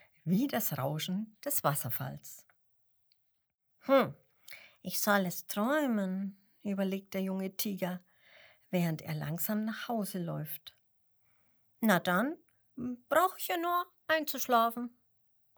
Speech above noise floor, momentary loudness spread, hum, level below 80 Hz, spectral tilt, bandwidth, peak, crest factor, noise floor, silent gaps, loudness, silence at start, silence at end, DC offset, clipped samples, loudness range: 46 dB; 15 LU; none; -78 dBFS; -5 dB/octave; over 20 kHz; -10 dBFS; 24 dB; -79 dBFS; none; -33 LUFS; 0.25 s; 0.7 s; under 0.1%; under 0.1%; 5 LU